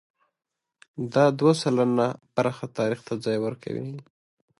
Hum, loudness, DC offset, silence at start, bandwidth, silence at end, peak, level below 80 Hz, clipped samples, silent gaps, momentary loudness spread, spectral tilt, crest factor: none; -25 LUFS; under 0.1%; 0.95 s; 11.5 kHz; 0.6 s; -8 dBFS; -70 dBFS; under 0.1%; none; 14 LU; -6.5 dB/octave; 18 dB